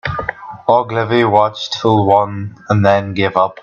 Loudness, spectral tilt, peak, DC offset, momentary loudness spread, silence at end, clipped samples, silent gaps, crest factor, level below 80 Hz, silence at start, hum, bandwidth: -14 LUFS; -6.5 dB/octave; 0 dBFS; under 0.1%; 10 LU; 0.1 s; under 0.1%; none; 14 dB; -48 dBFS; 0.05 s; none; 7.2 kHz